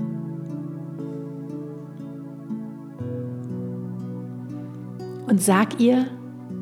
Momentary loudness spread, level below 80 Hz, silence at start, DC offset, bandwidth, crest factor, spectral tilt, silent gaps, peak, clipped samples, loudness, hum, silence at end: 17 LU; -74 dBFS; 0 s; under 0.1%; 16 kHz; 22 dB; -6 dB/octave; none; -4 dBFS; under 0.1%; -27 LUFS; none; 0 s